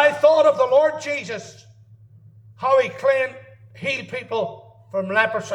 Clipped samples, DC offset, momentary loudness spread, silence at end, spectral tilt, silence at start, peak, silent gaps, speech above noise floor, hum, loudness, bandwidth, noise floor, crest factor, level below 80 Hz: under 0.1%; under 0.1%; 14 LU; 0 s; -4 dB/octave; 0 s; -4 dBFS; none; 26 dB; none; -20 LUFS; 10.5 kHz; -48 dBFS; 18 dB; -70 dBFS